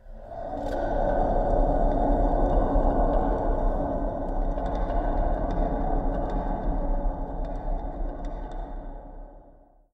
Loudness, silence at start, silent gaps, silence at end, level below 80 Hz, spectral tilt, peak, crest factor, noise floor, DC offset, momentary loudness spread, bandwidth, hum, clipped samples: -28 LUFS; 0.05 s; none; 0.4 s; -28 dBFS; -9.5 dB/octave; -10 dBFS; 16 dB; -54 dBFS; under 0.1%; 14 LU; 3.9 kHz; none; under 0.1%